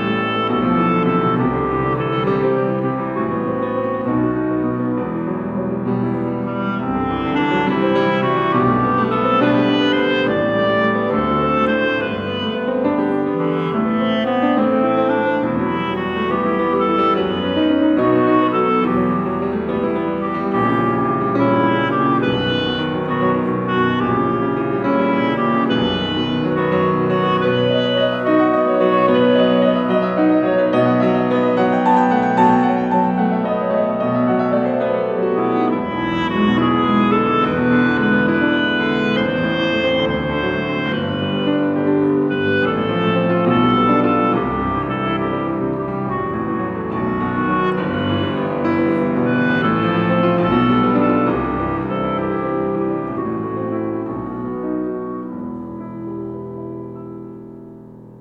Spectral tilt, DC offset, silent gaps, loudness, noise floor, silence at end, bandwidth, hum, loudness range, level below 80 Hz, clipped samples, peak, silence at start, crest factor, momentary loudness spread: -8 dB/octave; under 0.1%; none; -18 LUFS; -38 dBFS; 0 s; 6.8 kHz; none; 5 LU; -46 dBFS; under 0.1%; -4 dBFS; 0 s; 14 dB; 7 LU